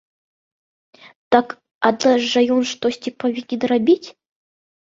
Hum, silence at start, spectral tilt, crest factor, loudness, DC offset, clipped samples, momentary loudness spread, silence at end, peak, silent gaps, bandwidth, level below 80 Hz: none; 1.3 s; -4 dB/octave; 18 dB; -19 LUFS; under 0.1%; under 0.1%; 8 LU; 0.75 s; -2 dBFS; 1.71-1.81 s; 7.8 kHz; -66 dBFS